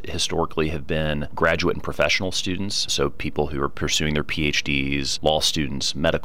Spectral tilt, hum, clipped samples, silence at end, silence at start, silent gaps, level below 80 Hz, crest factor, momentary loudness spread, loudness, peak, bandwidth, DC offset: -3.5 dB/octave; none; under 0.1%; 0 s; 0 s; none; -38 dBFS; 18 dB; 5 LU; -23 LUFS; -6 dBFS; 16.5 kHz; 3%